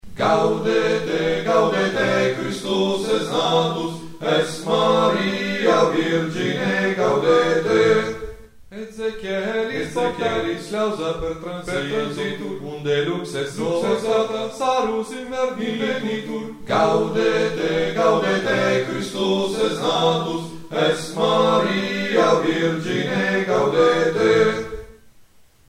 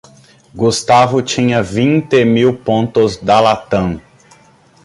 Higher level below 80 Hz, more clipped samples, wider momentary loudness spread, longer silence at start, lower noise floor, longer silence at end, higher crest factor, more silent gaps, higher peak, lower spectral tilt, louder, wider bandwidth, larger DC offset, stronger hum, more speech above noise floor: second, -50 dBFS vs -42 dBFS; neither; first, 10 LU vs 7 LU; second, 0.05 s vs 0.55 s; first, -51 dBFS vs -47 dBFS; second, 0.45 s vs 0.85 s; about the same, 16 dB vs 14 dB; neither; second, -4 dBFS vs 0 dBFS; about the same, -5 dB/octave vs -5.5 dB/octave; second, -20 LUFS vs -13 LUFS; first, 15 kHz vs 11.5 kHz; neither; neither; second, 30 dB vs 35 dB